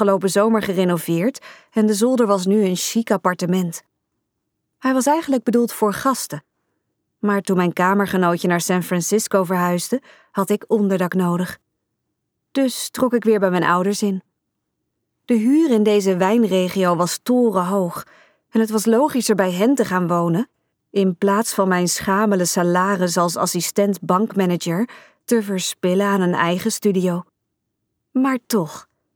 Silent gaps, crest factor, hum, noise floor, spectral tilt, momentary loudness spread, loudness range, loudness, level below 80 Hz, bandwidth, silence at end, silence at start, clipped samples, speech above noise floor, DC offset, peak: none; 16 dB; none; -76 dBFS; -5 dB/octave; 8 LU; 3 LU; -19 LUFS; -64 dBFS; 19.5 kHz; 0.35 s; 0 s; under 0.1%; 58 dB; under 0.1%; -4 dBFS